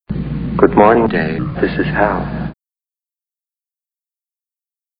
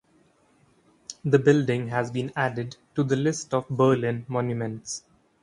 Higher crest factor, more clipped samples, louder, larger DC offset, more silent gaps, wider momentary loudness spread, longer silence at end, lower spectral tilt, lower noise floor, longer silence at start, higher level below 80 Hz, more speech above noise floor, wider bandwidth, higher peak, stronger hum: about the same, 18 dB vs 20 dB; neither; first, -15 LUFS vs -25 LUFS; neither; neither; about the same, 13 LU vs 14 LU; first, 2.45 s vs 0.45 s; first, -11.5 dB/octave vs -6 dB/octave; first, under -90 dBFS vs -62 dBFS; second, 0.1 s vs 1.1 s; first, -34 dBFS vs -64 dBFS; first, over 77 dB vs 38 dB; second, 5.2 kHz vs 11 kHz; first, 0 dBFS vs -6 dBFS; neither